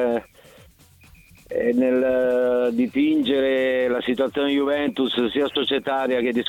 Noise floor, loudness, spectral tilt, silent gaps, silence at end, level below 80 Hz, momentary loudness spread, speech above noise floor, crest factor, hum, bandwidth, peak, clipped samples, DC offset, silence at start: -51 dBFS; -21 LUFS; -5.5 dB/octave; none; 0 s; -56 dBFS; 3 LU; 31 dB; 14 dB; none; 16.5 kHz; -8 dBFS; under 0.1%; under 0.1%; 0 s